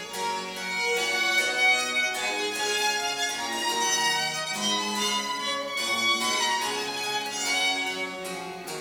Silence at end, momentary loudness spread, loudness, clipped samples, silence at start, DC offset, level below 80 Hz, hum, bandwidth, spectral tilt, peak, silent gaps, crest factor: 0 s; 8 LU; -25 LUFS; under 0.1%; 0 s; under 0.1%; -70 dBFS; none; over 20 kHz; -0.5 dB/octave; -12 dBFS; none; 16 dB